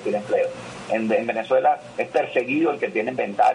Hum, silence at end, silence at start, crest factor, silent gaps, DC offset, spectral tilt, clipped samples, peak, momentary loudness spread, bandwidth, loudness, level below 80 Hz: none; 0 s; 0 s; 14 dB; none; under 0.1%; -5.5 dB/octave; under 0.1%; -8 dBFS; 6 LU; 10.5 kHz; -23 LUFS; -66 dBFS